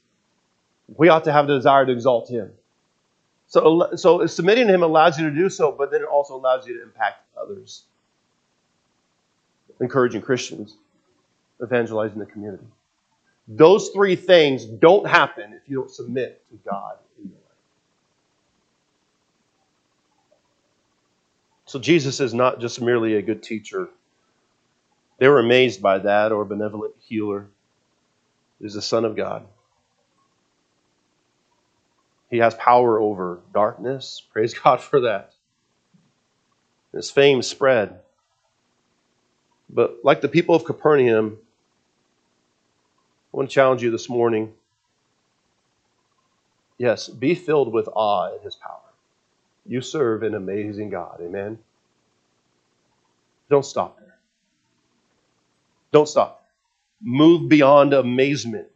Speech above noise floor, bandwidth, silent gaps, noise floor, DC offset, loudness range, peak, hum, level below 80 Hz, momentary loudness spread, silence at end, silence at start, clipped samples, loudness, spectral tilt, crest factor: 53 dB; 8.4 kHz; none; -72 dBFS; under 0.1%; 11 LU; 0 dBFS; none; -74 dBFS; 18 LU; 0.1 s; 0.9 s; under 0.1%; -19 LUFS; -5.5 dB/octave; 22 dB